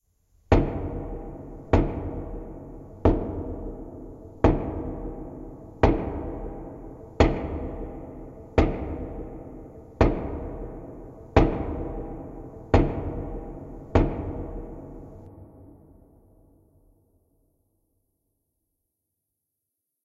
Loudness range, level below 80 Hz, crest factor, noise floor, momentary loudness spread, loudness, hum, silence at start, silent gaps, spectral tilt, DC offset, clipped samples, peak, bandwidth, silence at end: 5 LU; -34 dBFS; 28 dB; -83 dBFS; 19 LU; -27 LUFS; none; 0.5 s; none; -8.5 dB/octave; under 0.1%; under 0.1%; 0 dBFS; 7.4 kHz; 4.3 s